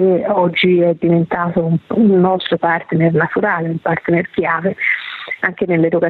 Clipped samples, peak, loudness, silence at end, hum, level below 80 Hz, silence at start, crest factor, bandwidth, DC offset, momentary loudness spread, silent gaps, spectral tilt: under 0.1%; -2 dBFS; -15 LUFS; 0 s; none; -52 dBFS; 0 s; 12 dB; 4.5 kHz; under 0.1%; 6 LU; none; -9.5 dB/octave